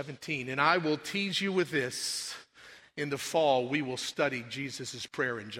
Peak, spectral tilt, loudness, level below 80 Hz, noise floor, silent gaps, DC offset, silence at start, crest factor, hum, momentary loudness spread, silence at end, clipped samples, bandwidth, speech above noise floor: -10 dBFS; -3.5 dB/octave; -31 LUFS; -74 dBFS; -55 dBFS; none; under 0.1%; 0 s; 22 dB; none; 11 LU; 0 s; under 0.1%; 16 kHz; 23 dB